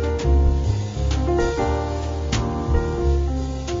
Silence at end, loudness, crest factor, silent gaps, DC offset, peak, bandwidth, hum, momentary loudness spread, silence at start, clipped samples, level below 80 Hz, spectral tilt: 0 s; -22 LUFS; 14 dB; none; under 0.1%; -8 dBFS; 7.6 kHz; none; 6 LU; 0 s; under 0.1%; -22 dBFS; -7 dB/octave